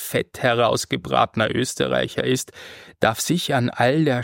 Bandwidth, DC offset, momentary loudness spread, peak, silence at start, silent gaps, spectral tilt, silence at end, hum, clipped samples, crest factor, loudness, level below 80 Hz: 17 kHz; under 0.1%; 6 LU; -2 dBFS; 0 s; none; -4.5 dB/octave; 0 s; none; under 0.1%; 20 dB; -21 LUFS; -54 dBFS